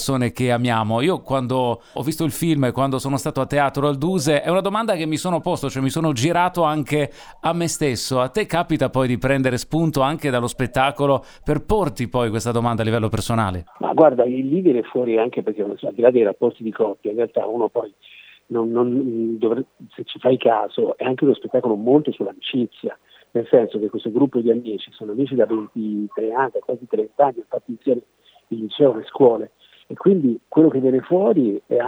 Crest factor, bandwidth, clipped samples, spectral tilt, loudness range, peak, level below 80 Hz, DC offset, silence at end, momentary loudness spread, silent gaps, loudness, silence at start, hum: 20 dB; over 20 kHz; under 0.1%; -6 dB/octave; 3 LU; 0 dBFS; -46 dBFS; under 0.1%; 0 s; 9 LU; none; -20 LUFS; 0 s; none